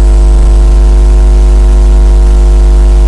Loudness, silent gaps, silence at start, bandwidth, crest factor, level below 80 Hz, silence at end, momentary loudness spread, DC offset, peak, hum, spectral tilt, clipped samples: -7 LUFS; none; 0 s; 10 kHz; 2 dB; -2 dBFS; 0 s; 0 LU; under 0.1%; 0 dBFS; 50 Hz at -5 dBFS; -7 dB/octave; under 0.1%